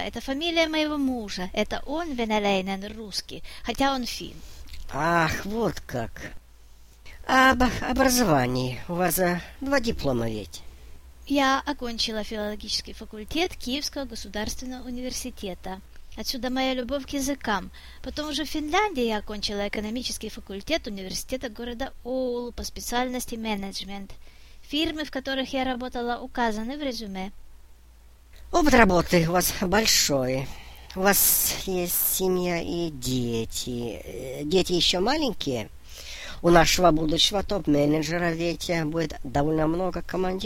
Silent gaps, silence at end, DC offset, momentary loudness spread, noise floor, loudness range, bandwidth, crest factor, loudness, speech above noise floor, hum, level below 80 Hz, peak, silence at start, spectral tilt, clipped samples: none; 0 s; under 0.1%; 16 LU; -51 dBFS; 8 LU; 16.5 kHz; 24 dB; -25 LUFS; 25 dB; none; -40 dBFS; -2 dBFS; 0 s; -3.5 dB/octave; under 0.1%